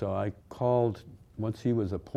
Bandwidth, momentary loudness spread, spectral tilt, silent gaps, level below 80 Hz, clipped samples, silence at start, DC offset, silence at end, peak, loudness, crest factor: 9 kHz; 12 LU; -9 dB/octave; none; -56 dBFS; under 0.1%; 0 s; under 0.1%; 0 s; -14 dBFS; -31 LUFS; 16 dB